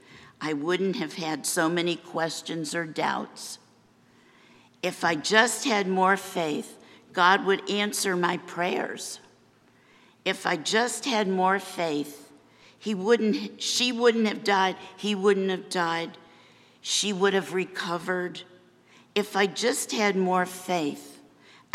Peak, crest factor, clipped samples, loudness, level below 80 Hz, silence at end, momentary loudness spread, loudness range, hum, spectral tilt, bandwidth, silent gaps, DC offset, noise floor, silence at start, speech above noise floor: -4 dBFS; 24 dB; under 0.1%; -26 LUFS; -80 dBFS; 0.6 s; 11 LU; 4 LU; none; -3.5 dB/octave; 15.5 kHz; none; under 0.1%; -60 dBFS; 0.1 s; 34 dB